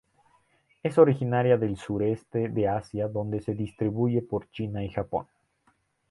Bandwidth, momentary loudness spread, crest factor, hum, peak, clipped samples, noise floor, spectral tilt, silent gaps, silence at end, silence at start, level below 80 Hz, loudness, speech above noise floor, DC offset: 11.5 kHz; 12 LU; 22 dB; none; -6 dBFS; under 0.1%; -69 dBFS; -9 dB/octave; none; 0.9 s; 0.85 s; -54 dBFS; -27 LUFS; 43 dB; under 0.1%